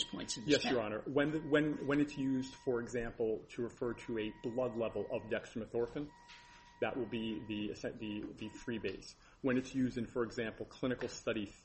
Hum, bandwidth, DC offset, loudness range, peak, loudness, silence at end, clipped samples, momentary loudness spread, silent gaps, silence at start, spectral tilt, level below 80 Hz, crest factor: none; 8.4 kHz; under 0.1%; 6 LU; -16 dBFS; -38 LUFS; 0.1 s; under 0.1%; 10 LU; none; 0 s; -5 dB/octave; -62 dBFS; 22 dB